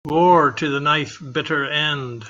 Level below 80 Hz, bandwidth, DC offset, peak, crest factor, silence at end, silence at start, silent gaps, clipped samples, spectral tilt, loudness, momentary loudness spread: -56 dBFS; 7.6 kHz; under 0.1%; -2 dBFS; 16 dB; 0 s; 0.05 s; none; under 0.1%; -5.5 dB/octave; -18 LUFS; 9 LU